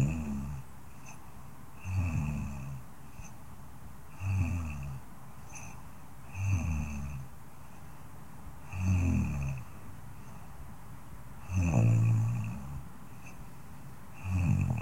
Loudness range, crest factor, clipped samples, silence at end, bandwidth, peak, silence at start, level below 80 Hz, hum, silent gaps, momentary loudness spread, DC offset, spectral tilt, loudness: 7 LU; 20 dB; under 0.1%; 0 s; 16.5 kHz; -16 dBFS; 0 s; -48 dBFS; none; none; 21 LU; 0.6%; -7.5 dB/octave; -33 LUFS